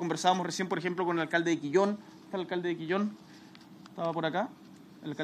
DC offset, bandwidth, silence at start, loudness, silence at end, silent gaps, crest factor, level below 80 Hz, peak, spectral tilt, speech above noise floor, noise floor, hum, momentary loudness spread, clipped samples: under 0.1%; 13.5 kHz; 0 s; -31 LUFS; 0 s; none; 20 dB; -80 dBFS; -12 dBFS; -5 dB/octave; 22 dB; -52 dBFS; none; 18 LU; under 0.1%